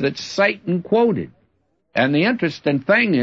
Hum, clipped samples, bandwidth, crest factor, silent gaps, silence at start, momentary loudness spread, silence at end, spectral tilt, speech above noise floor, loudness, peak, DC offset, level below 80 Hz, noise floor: none; under 0.1%; 7.8 kHz; 16 dB; none; 0 s; 9 LU; 0 s; -6 dB/octave; 48 dB; -19 LUFS; -4 dBFS; under 0.1%; -62 dBFS; -66 dBFS